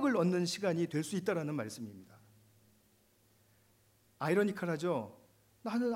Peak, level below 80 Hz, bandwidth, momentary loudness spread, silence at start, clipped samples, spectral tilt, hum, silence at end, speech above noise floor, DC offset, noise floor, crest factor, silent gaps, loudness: -20 dBFS; -82 dBFS; 16 kHz; 15 LU; 0 s; under 0.1%; -6 dB/octave; none; 0 s; 35 dB; under 0.1%; -70 dBFS; 18 dB; none; -35 LUFS